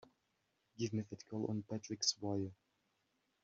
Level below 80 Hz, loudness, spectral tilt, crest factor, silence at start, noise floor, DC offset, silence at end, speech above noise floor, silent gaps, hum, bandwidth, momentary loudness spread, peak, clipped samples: -80 dBFS; -41 LUFS; -5.5 dB/octave; 24 dB; 0.8 s; -83 dBFS; under 0.1%; 0.9 s; 42 dB; none; none; 7.4 kHz; 9 LU; -20 dBFS; under 0.1%